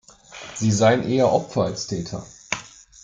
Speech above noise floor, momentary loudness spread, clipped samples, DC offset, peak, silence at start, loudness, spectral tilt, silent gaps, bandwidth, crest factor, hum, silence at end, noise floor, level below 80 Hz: 21 dB; 17 LU; under 0.1%; under 0.1%; -4 dBFS; 0.3 s; -22 LUFS; -5 dB/octave; none; 9.6 kHz; 18 dB; none; 0.35 s; -42 dBFS; -56 dBFS